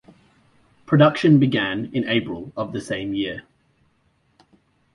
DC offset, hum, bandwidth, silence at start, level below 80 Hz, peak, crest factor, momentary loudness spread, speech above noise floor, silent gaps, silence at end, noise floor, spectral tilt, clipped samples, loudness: under 0.1%; none; 11 kHz; 0.9 s; -56 dBFS; -2 dBFS; 20 dB; 14 LU; 45 dB; none; 1.55 s; -64 dBFS; -7 dB/octave; under 0.1%; -20 LUFS